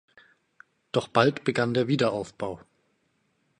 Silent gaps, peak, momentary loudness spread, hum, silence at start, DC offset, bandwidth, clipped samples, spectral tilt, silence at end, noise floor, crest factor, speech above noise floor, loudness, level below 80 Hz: none; -4 dBFS; 13 LU; none; 0.95 s; under 0.1%; 11 kHz; under 0.1%; -6 dB/octave; 1.05 s; -72 dBFS; 24 dB; 46 dB; -26 LUFS; -64 dBFS